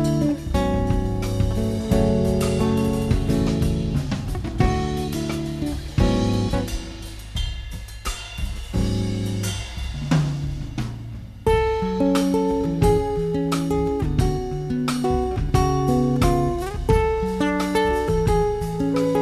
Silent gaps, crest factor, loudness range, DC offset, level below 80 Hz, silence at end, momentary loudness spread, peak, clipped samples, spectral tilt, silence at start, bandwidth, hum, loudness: none; 18 dB; 5 LU; under 0.1%; -30 dBFS; 0 s; 10 LU; -4 dBFS; under 0.1%; -6.5 dB/octave; 0 s; 14 kHz; none; -23 LUFS